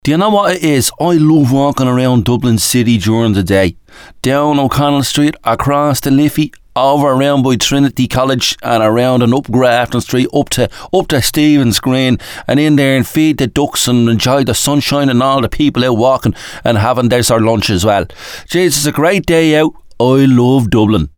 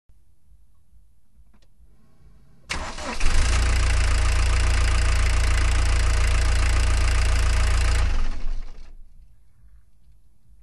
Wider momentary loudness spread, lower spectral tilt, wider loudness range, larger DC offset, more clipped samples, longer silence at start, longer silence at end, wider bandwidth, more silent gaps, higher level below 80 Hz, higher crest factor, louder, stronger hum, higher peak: second, 5 LU vs 9 LU; about the same, -5 dB/octave vs -4 dB/octave; second, 1 LU vs 7 LU; second, under 0.1% vs 0.4%; neither; second, 0.05 s vs 2.7 s; second, 0.1 s vs 1.4 s; first, over 20 kHz vs 12 kHz; neither; second, -36 dBFS vs -22 dBFS; about the same, 10 dB vs 14 dB; first, -11 LUFS vs -24 LUFS; neither; first, 0 dBFS vs -6 dBFS